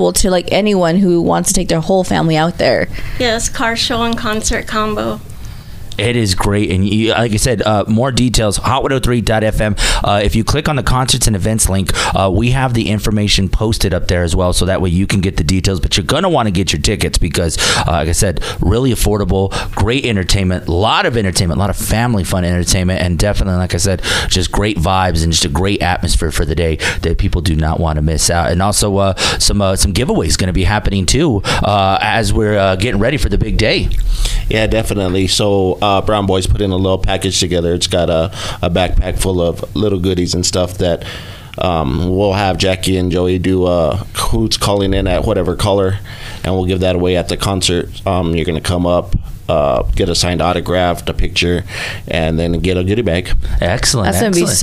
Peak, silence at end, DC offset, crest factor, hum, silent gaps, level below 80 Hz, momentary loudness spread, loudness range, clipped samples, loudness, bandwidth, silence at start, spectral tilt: 0 dBFS; 0 s; 0.5%; 14 dB; none; none; -22 dBFS; 4 LU; 2 LU; under 0.1%; -14 LUFS; 16 kHz; 0 s; -4.5 dB/octave